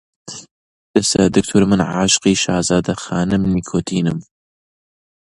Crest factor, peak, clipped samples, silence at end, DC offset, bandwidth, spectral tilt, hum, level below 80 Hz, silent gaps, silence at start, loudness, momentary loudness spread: 18 dB; 0 dBFS; under 0.1%; 1.1 s; under 0.1%; 11.5 kHz; -4.5 dB/octave; none; -42 dBFS; 0.51-0.94 s; 0.25 s; -16 LUFS; 16 LU